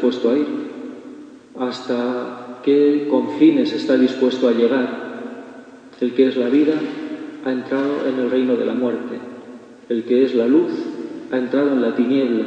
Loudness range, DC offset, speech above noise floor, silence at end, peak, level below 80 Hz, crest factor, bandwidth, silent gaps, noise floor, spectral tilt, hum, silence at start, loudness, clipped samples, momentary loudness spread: 4 LU; under 0.1%; 23 dB; 0 s; -2 dBFS; -72 dBFS; 16 dB; 8.2 kHz; none; -40 dBFS; -6.5 dB/octave; none; 0 s; -19 LUFS; under 0.1%; 17 LU